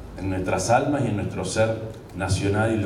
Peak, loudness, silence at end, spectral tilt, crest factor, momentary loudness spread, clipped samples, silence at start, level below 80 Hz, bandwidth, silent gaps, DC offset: -6 dBFS; -24 LUFS; 0 s; -5.5 dB/octave; 18 dB; 10 LU; under 0.1%; 0 s; -46 dBFS; 14 kHz; none; under 0.1%